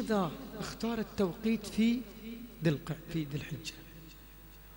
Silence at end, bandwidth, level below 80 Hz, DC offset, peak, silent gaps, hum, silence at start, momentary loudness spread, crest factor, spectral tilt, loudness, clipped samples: 0 s; 16.5 kHz; -56 dBFS; under 0.1%; -18 dBFS; none; 50 Hz at -55 dBFS; 0 s; 20 LU; 18 dB; -6 dB/octave; -35 LUFS; under 0.1%